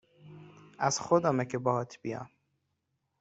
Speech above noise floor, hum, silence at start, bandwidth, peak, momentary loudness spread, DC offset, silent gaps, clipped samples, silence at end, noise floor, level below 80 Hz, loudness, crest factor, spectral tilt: 51 dB; none; 0.25 s; 8.2 kHz; -10 dBFS; 17 LU; under 0.1%; none; under 0.1%; 0.95 s; -81 dBFS; -70 dBFS; -30 LUFS; 22 dB; -5 dB/octave